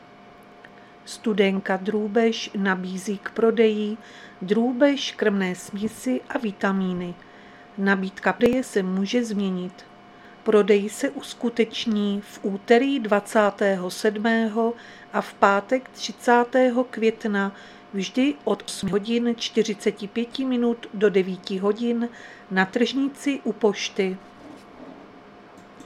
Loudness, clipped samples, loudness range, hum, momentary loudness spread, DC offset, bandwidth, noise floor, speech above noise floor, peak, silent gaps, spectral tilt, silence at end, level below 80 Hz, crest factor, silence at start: -23 LUFS; under 0.1%; 3 LU; none; 11 LU; under 0.1%; 14 kHz; -48 dBFS; 25 dB; -2 dBFS; none; -5 dB/octave; 0 s; -64 dBFS; 22 dB; 0.65 s